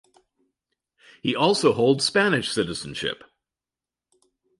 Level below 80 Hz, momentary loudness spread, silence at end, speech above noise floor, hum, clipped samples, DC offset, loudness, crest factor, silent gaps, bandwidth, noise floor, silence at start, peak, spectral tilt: -60 dBFS; 11 LU; 1.45 s; over 68 dB; none; under 0.1%; under 0.1%; -22 LUFS; 20 dB; none; 11.5 kHz; under -90 dBFS; 1.25 s; -6 dBFS; -4 dB/octave